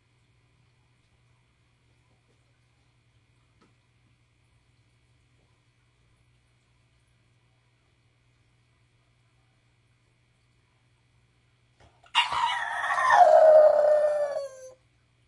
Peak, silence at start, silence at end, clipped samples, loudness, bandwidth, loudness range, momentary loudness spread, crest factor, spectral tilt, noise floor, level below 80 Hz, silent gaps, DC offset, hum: -6 dBFS; 12.15 s; 0.6 s; under 0.1%; -21 LUFS; 11.5 kHz; 11 LU; 17 LU; 22 dB; -1.5 dB/octave; -67 dBFS; -72 dBFS; none; under 0.1%; 60 Hz at -70 dBFS